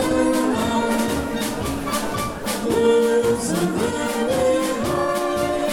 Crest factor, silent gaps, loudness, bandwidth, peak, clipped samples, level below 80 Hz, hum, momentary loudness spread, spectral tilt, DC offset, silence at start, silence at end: 14 dB; none; -21 LUFS; 17.5 kHz; -6 dBFS; under 0.1%; -42 dBFS; none; 7 LU; -4.5 dB/octave; under 0.1%; 0 s; 0 s